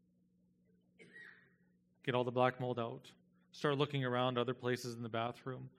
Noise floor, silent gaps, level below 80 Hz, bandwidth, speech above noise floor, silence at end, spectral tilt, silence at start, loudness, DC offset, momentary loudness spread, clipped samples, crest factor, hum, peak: -74 dBFS; none; -84 dBFS; 14.5 kHz; 36 dB; 0.1 s; -6 dB/octave; 1 s; -38 LUFS; under 0.1%; 21 LU; under 0.1%; 24 dB; 60 Hz at -65 dBFS; -16 dBFS